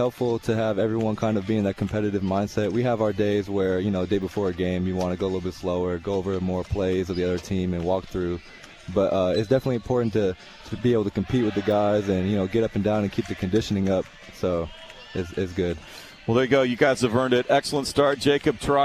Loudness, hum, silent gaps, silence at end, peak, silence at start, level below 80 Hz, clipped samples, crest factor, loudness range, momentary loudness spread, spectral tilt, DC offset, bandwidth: -24 LUFS; none; none; 0 s; -6 dBFS; 0 s; -48 dBFS; under 0.1%; 18 dB; 3 LU; 8 LU; -6.5 dB/octave; under 0.1%; 14 kHz